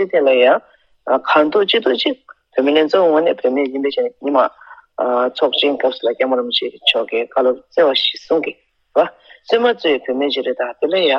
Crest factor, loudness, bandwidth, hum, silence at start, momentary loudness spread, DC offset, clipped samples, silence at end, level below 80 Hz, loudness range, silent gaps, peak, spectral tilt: 16 dB; -16 LUFS; 7 kHz; none; 0 s; 7 LU; under 0.1%; under 0.1%; 0 s; -68 dBFS; 2 LU; none; 0 dBFS; -4.5 dB/octave